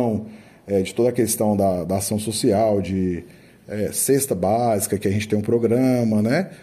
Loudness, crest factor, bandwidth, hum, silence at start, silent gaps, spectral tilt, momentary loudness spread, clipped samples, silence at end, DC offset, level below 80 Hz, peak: -21 LUFS; 14 dB; 16 kHz; none; 0 s; none; -5.5 dB/octave; 7 LU; under 0.1%; 0.05 s; under 0.1%; -54 dBFS; -6 dBFS